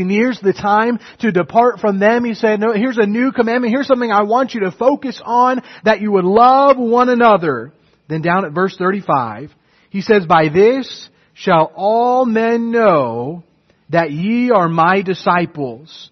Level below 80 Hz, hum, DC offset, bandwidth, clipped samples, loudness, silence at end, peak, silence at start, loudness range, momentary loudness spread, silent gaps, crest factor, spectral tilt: -56 dBFS; none; under 0.1%; 6.4 kHz; under 0.1%; -14 LUFS; 0.05 s; 0 dBFS; 0 s; 3 LU; 11 LU; none; 14 dB; -7 dB/octave